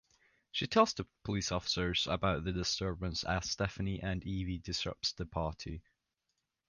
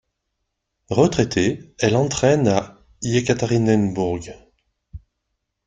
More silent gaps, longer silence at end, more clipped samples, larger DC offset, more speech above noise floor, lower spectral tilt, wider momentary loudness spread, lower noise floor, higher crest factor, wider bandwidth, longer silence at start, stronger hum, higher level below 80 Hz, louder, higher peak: neither; first, 0.9 s vs 0.7 s; neither; neither; second, 50 dB vs 58 dB; about the same, -4.5 dB/octave vs -5.5 dB/octave; about the same, 8 LU vs 9 LU; first, -85 dBFS vs -77 dBFS; about the same, 24 dB vs 20 dB; about the same, 10 kHz vs 9.4 kHz; second, 0.55 s vs 0.9 s; neither; about the same, -50 dBFS vs -48 dBFS; second, -35 LUFS vs -20 LUFS; second, -14 dBFS vs -2 dBFS